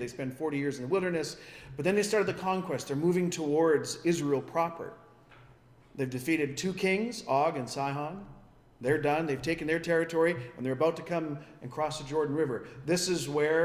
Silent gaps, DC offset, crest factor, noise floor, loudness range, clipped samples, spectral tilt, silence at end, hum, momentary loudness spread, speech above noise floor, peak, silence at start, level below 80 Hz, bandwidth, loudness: none; under 0.1%; 16 dB; -58 dBFS; 3 LU; under 0.1%; -5 dB/octave; 0 s; none; 10 LU; 28 dB; -14 dBFS; 0 s; -62 dBFS; 16 kHz; -30 LUFS